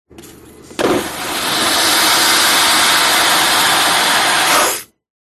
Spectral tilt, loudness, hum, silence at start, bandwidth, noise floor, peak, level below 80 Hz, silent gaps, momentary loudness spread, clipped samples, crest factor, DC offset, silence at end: 0 dB/octave; -11 LUFS; none; 0.2 s; 13.5 kHz; -38 dBFS; 0 dBFS; -48 dBFS; none; 9 LU; under 0.1%; 14 dB; under 0.1%; 0.5 s